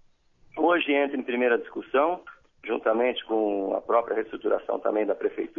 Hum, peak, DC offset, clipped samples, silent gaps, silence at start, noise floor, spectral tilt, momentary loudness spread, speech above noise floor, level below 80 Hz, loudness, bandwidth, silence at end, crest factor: none; -10 dBFS; under 0.1%; under 0.1%; none; 0.55 s; -59 dBFS; -7 dB/octave; 6 LU; 33 dB; -66 dBFS; -26 LUFS; 3.8 kHz; 0.1 s; 18 dB